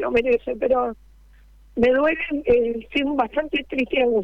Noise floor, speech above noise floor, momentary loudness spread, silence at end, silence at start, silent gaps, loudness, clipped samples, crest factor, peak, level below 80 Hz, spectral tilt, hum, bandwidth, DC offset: -50 dBFS; 29 dB; 5 LU; 0 s; 0 s; none; -21 LUFS; under 0.1%; 18 dB; -4 dBFS; -46 dBFS; -6.5 dB/octave; none; 6 kHz; under 0.1%